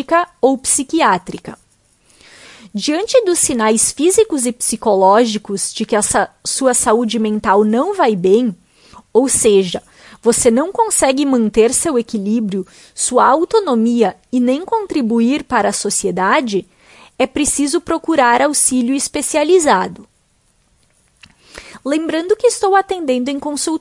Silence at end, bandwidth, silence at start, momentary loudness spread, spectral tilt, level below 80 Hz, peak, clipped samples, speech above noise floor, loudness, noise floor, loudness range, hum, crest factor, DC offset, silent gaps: 0 s; 11.5 kHz; 0 s; 8 LU; -3 dB/octave; -48 dBFS; 0 dBFS; under 0.1%; 44 dB; -14 LUFS; -58 dBFS; 4 LU; none; 16 dB; under 0.1%; none